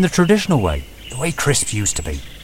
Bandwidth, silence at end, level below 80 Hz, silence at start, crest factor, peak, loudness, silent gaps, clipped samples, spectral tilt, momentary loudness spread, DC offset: 16.5 kHz; 0 s; -32 dBFS; 0 s; 18 dB; 0 dBFS; -18 LUFS; none; under 0.1%; -4.5 dB/octave; 13 LU; under 0.1%